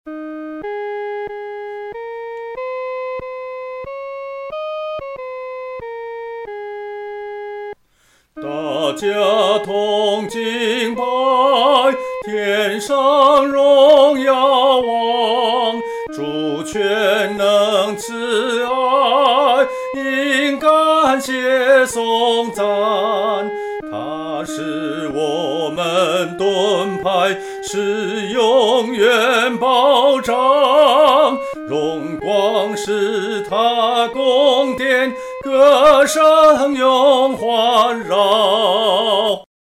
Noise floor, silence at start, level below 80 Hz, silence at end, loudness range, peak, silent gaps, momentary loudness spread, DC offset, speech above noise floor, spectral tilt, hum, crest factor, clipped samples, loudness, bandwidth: -57 dBFS; 0.05 s; -56 dBFS; 0.35 s; 14 LU; -2 dBFS; none; 17 LU; under 0.1%; 42 dB; -3.5 dB/octave; none; 14 dB; under 0.1%; -15 LUFS; 15.5 kHz